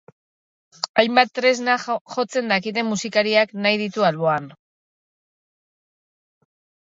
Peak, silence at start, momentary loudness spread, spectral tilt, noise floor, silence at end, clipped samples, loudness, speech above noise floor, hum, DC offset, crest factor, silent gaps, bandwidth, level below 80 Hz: 0 dBFS; 0.85 s; 7 LU; -4 dB/octave; under -90 dBFS; 2.3 s; under 0.1%; -20 LUFS; over 70 dB; none; under 0.1%; 22 dB; 0.89-0.94 s, 2.01-2.05 s; 8 kHz; -70 dBFS